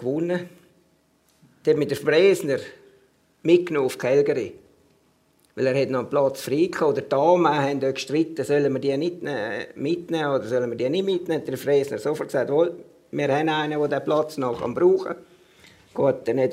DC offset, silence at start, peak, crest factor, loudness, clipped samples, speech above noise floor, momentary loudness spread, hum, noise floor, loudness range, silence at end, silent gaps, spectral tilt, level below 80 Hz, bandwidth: under 0.1%; 0 s; -4 dBFS; 18 dB; -23 LUFS; under 0.1%; 41 dB; 9 LU; none; -63 dBFS; 3 LU; 0 s; none; -6 dB/octave; -68 dBFS; 16 kHz